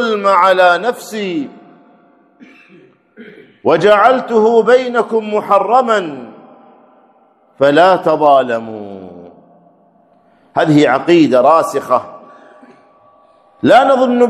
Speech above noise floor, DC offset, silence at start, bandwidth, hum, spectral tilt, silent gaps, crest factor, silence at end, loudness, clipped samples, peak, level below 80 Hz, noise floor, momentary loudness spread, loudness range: 40 dB; under 0.1%; 0 s; 13.5 kHz; none; -5.5 dB/octave; none; 14 dB; 0 s; -12 LUFS; 0.2%; 0 dBFS; -62 dBFS; -51 dBFS; 14 LU; 4 LU